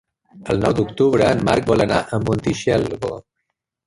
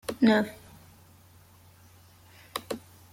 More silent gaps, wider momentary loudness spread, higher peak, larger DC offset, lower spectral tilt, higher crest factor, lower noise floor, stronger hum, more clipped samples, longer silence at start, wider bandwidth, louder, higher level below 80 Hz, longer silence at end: neither; second, 11 LU vs 17 LU; first, -2 dBFS vs -8 dBFS; neither; first, -6.5 dB/octave vs -5 dB/octave; second, 18 dB vs 24 dB; first, -76 dBFS vs -56 dBFS; neither; neither; first, 0.35 s vs 0.1 s; second, 11.5 kHz vs 16.5 kHz; first, -19 LUFS vs -28 LUFS; first, -42 dBFS vs -66 dBFS; first, 0.65 s vs 0.35 s